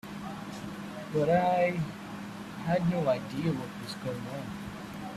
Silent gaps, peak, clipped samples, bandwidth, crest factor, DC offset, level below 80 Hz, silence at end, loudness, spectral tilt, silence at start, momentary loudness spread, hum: none; -12 dBFS; under 0.1%; 14.5 kHz; 18 dB; under 0.1%; -60 dBFS; 0 s; -32 LUFS; -7 dB/octave; 0.05 s; 14 LU; none